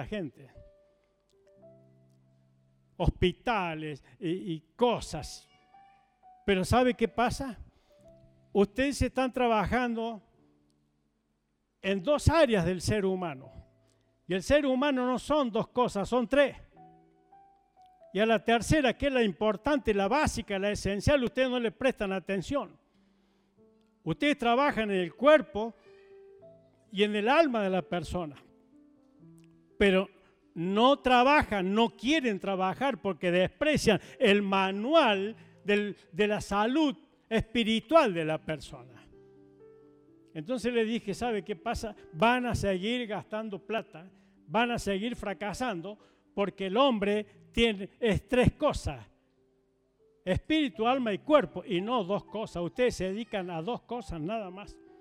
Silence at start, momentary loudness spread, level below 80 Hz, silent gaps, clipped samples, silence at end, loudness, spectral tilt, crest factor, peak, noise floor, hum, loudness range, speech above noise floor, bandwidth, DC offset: 0 s; 14 LU; -48 dBFS; none; under 0.1%; 0.3 s; -29 LUFS; -5.5 dB/octave; 20 dB; -10 dBFS; -77 dBFS; none; 6 LU; 48 dB; 15.5 kHz; under 0.1%